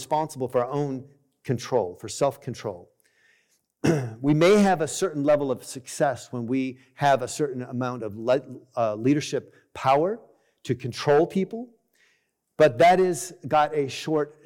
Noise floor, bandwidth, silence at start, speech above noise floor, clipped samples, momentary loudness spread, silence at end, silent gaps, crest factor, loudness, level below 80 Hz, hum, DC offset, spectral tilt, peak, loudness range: -70 dBFS; 17 kHz; 0 s; 46 dB; under 0.1%; 16 LU; 0.15 s; none; 14 dB; -24 LUFS; -62 dBFS; none; under 0.1%; -5.5 dB/octave; -10 dBFS; 5 LU